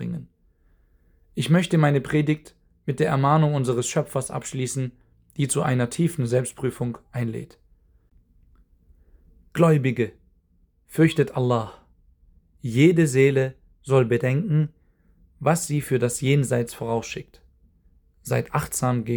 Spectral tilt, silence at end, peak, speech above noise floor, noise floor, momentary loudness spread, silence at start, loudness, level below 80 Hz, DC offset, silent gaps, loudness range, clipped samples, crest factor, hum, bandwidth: -6 dB/octave; 0 s; -4 dBFS; 40 dB; -62 dBFS; 14 LU; 0 s; -23 LUFS; -54 dBFS; under 0.1%; none; 5 LU; under 0.1%; 20 dB; none; over 20 kHz